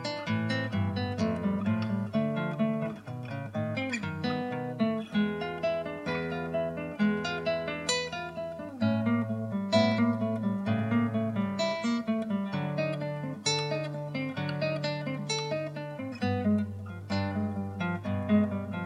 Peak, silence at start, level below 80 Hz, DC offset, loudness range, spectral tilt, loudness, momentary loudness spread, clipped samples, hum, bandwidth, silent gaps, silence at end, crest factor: -12 dBFS; 0 s; -64 dBFS; under 0.1%; 3 LU; -5.5 dB/octave; -31 LUFS; 7 LU; under 0.1%; none; 11.5 kHz; none; 0 s; 18 dB